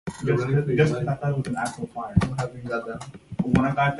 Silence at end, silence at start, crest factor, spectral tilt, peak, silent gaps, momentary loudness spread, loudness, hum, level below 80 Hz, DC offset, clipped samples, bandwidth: 0 s; 0.05 s; 20 dB; -7.5 dB/octave; -4 dBFS; none; 11 LU; -25 LUFS; none; -42 dBFS; under 0.1%; under 0.1%; 11.5 kHz